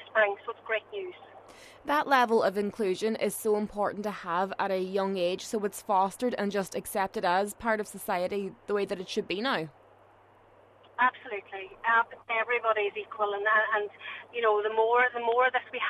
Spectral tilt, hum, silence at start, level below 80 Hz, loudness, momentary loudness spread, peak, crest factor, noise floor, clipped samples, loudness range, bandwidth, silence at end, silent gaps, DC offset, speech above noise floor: -4 dB/octave; none; 0 s; -66 dBFS; -29 LUFS; 10 LU; -10 dBFS; 18 dB; -59 dBFS; under 0.1%; 5 LU; 14 kHz; 0 s; none; under 0.1%; 30 dB